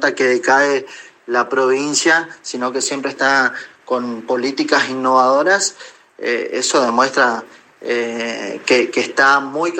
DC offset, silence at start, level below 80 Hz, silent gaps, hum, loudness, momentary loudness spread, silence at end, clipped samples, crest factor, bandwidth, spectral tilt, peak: under 0.1%; 0 s; -74 dBFS; none; none; -16 LUFS; 10 LU; 0 s; under 0.1%; 16 dB; 16 kHz; -2 dB/octave; 0 dBFS